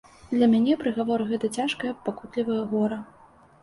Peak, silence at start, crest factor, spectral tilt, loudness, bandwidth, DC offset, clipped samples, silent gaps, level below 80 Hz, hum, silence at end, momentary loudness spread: -10 dBFS; 0.25 s; 16 dB; -6 dB/octave; -25 LUFS; 11.5 kHz; under 0.1%; under 0.1%; none; -62 dBFS; none; 0.55 s; 10 LU